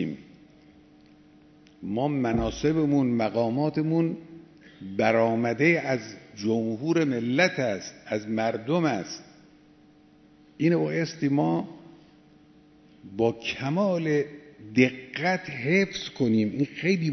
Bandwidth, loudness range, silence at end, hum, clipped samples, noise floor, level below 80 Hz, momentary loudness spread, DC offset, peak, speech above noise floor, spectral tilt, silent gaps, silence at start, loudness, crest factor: 6.4 kHz; 4 LU; 0 s; none; under 0.1%; -56 dBFS; -56 dBFS; 11 LU; under 0.1%; -6 dBFS; 31 dB; -6.5 dB/octave; none; 0 s; -26 LUFS; 22 dB